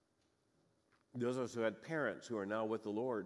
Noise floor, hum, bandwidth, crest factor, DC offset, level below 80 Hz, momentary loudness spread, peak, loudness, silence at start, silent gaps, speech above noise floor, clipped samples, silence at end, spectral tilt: -79 dBFS; none; 12 kHz; 18 dB; under 0.1%; -88 dBFS; 3 LU; -24 dBFS; -41 LUFS; 1.15 s; none; 39 dB; under 0.1%; 0 s; -6 dB/octave